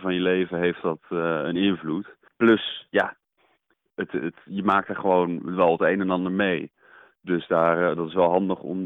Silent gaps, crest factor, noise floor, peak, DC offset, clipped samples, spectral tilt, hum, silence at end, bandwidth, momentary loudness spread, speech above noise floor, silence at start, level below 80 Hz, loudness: none; 16 dB; -69 dBFS; -8 dBFS; under 0.1%; under 0.1%; -8.5 dB/octave; none; 0 s; 4.1 kHz; 11 LU; 46 dB; 0 s; -62 dBFS; -24 LUFS